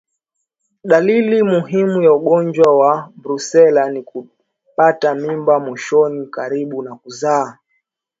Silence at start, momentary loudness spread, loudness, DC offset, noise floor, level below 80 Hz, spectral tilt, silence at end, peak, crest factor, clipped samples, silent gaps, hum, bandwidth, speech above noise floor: 0.85 s; 15 LU; -15 LUFS; under 0.1%; -74 dBFS; -66 dBFS; -6 dB/octave; 0.7 s; 0 dBFS; 16 dB; under 0.1%; none; none; 7.8 kHz; 60 dB